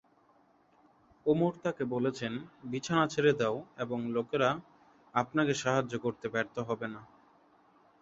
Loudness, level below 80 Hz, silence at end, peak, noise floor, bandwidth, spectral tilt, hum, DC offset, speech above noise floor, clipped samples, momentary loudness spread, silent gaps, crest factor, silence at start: -32 LUFS; -68 dBFS; 0.95 s; -12 dBFS; -66 dBFS; 8 kHz; -5.5 dB/octave; none; under 0.1%; 35 dB; under 0.1%; 11 LU; none; 22 dB; 1.25 s